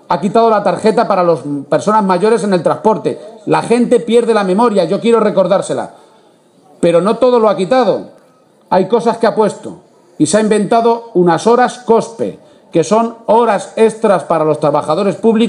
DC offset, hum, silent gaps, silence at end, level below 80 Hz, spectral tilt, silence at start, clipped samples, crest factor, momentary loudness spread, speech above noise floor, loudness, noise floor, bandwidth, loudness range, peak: under 0.1%; none; none; 0 s; -60 dBFS; -6 dB/octave; 0.1 s; under 0.1%; 12 dB; 6 LU; 36 dB; -12 LUFS; -48 dBFS; 11 kHz; 2 LU; 0 dBFS